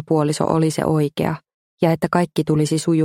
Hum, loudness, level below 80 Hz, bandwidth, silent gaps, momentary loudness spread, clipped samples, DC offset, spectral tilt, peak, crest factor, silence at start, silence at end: none; -19 LUFS; -52 dBFS; 16 kHz; 1.54-1.78 s; 4 LU; under 0.1%; under 0.1%; -6.5 dB/octave; 0 dBFS; 18 dB; 0 s; 0 s